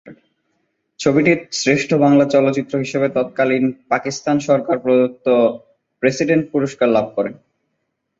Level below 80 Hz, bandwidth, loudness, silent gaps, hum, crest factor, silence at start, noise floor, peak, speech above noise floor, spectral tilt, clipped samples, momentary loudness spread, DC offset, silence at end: -60 dBFS; 8 kHz; -17 LUFS; none; none; 16 dB; 0.05 s; -73 dBFS; -2 dBFS; 56 dB; -5.5 dB/octave; under 0.1%; 8 LU; under 0.1%; 0.85 s